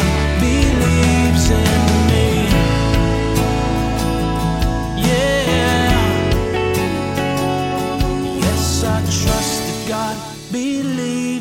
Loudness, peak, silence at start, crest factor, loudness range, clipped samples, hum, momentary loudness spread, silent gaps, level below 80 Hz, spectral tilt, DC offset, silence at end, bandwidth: -17 LUFS; -2 dBFS; 0 s; 14 dB; 4 LU; under 0.1%; none; 6 LU; none; -24 dBFS; -5 dB/octave; 0.2%; 0 s; 17 kHz